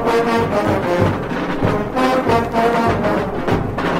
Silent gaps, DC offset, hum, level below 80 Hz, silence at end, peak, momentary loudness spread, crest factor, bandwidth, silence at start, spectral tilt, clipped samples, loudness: none; under 0.1%; none; -36 dBFS; 0 s; -4 dBFS; 4 LU; 14 dB; 16 kHz; 0 s; -6.5 dB/octave; under 0.1%; -17 LUFS